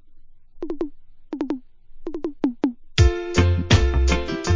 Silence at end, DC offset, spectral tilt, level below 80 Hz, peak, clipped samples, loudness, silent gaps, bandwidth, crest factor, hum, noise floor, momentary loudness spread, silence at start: 0 s; under 0.1%; -6 dB/octave; -26 dBFS; -2 dBFS; under 0.1%; -22 LUFS; none; 7.6 kHz; 20 dB; none; -42 dBFS; 16 LU; 0.1 s